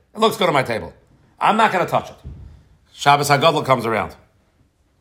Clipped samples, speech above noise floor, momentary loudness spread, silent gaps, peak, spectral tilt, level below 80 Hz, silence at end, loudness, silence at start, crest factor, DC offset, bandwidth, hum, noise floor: under 0.1%; 42 dB; 19 LU; none; 0 dBFS; -4.5 dB/octave; -50 dBFS; 0.85 s; -18 LUFS; 0.15 s; 20 dB; under 0.1%; 16 kHz; none; -60 dBFS